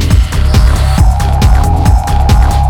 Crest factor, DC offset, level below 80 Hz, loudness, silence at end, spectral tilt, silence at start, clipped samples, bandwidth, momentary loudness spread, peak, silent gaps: 8 dB; under 0.1%; -8 dBFS; -10 LUFS; 0 s; -6 dB/octave; 0 s; 0.3%; 16.5 kHz; 1 LU; 0 dBFS; none